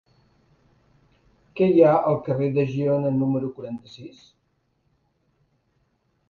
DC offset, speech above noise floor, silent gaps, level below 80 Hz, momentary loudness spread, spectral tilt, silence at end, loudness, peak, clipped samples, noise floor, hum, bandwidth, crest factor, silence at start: under 0.1%; 48 dB; none; -62 dBFS; 25 LU; -9.5 dB/octave; 2.2 s; -21 LUFS; -4 dBFS; under 0.1%; -70 dBFS; none; 7 kHz; 22 dB; 1.55 s